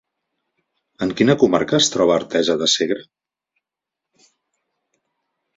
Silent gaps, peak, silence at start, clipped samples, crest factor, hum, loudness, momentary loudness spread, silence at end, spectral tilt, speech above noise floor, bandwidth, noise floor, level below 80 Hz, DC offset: none; -2 dBFS; 1 s; under 0.1%; 20 dB; none; -17 LUFS; 10 LU; 2.55 s; -4 dB/octave; 68 dB; 7.8 kHz; -85 dBFS; -58 dBFS; under 0.1%